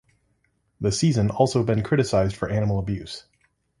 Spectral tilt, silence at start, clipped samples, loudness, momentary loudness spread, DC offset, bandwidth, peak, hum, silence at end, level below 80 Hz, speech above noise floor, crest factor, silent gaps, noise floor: -6 dB/octave; 0.8 s; under 0.1%; -23 LUFS; 10 LU; under 0.1%; 11.5 kHz; -4 dBFS; none; 0.6 s; -44 dBFS; 47 dB; 20 dB; none; -69 dBFS